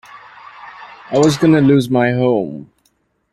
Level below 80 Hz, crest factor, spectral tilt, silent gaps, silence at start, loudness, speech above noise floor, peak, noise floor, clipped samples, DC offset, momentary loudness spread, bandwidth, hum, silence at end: -52 dBFS; 14 dB; -6.5 dB/octave; none; 0.15 s; -14 LUFS; 49 dB; -2 dBFS; -62 dBFS; under 0.1%; under 0.1%; 24 LU; 13.5 kHz; none; 0.7 s